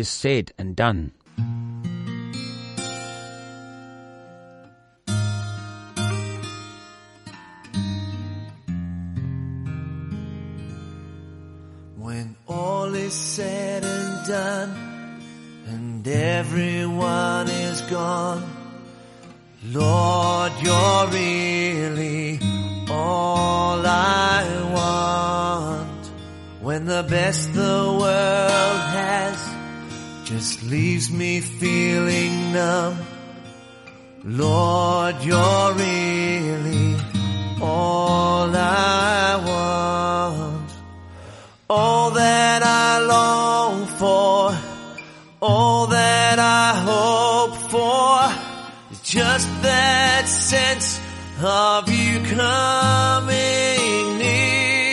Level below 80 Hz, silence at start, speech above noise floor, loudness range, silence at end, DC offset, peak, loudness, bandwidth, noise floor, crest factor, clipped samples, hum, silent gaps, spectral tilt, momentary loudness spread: -50 dBFS; 0 s; 31 dB; 13 LU; 0 s; under 0.1%; -4 dBFS; -20 LUFS; 11.5 kHz; -51 dBFS; 18 dB; under 0.1%; none; none; -4 dB/octave; 18 LU